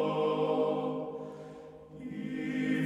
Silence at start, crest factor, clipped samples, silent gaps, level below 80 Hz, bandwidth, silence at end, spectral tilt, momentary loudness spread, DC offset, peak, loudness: 0 s; 14 dB; under 0.1%; none; -70 dBFS; 10.5 kHz; 0 s; -7.5 dB/octave; 18 LU; under 0.1%; -18 dBFS; -33 LUFS